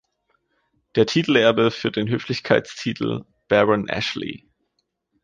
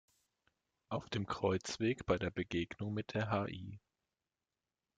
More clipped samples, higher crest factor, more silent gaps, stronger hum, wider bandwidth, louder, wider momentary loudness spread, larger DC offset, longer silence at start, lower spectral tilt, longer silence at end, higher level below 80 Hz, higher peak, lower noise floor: neither; about the same, 18 dB vs 20 dB; neither; neither; about the same, 9.4 kHz vs 9.4 kHz; first, -21 LUFS vs -39 LUFS; first, 12 LU vs 8 LU; neither; about the same, 0.95 s vs 0.9 s; about the same, -5.5 dB/octave vs -6 dB/octave; second, 0.85 s vs 1.2 s; first, -58 dBFS vs -64 dBFS; first, -4 dBFS vs -20 dBFS; second, -74 dBFS vs under -90 dBFS